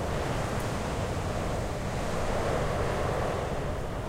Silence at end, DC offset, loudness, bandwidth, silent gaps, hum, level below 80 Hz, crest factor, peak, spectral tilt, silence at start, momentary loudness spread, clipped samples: 0 s; under 0.1%; -31 LUFS; 16 kHz; none; none; -38 dBFS; 14 dB; -16 dBFS; -5.5 dB/octave; 0 s; 3 LU; under 0.1%